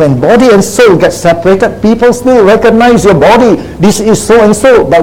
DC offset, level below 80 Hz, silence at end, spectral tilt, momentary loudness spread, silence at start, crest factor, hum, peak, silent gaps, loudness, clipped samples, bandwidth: under 0.1%; -30 dBFS; 0 s; -5.5 dB/octave; 4 LU; 0 s; 4 dB; none; 0 dBFS; none; -5 LUFS; 6%; 16.5 kHz